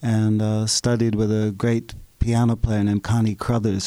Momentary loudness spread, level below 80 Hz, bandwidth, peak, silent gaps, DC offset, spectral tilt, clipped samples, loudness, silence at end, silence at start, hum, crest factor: 3 LU; -34 dBFS; 13 kHz; -6 dBFS; none; under 0.1%; -6 dB/octave; under 0.1%; -21 LUFS; 0 s; 0 s; none; 14 dB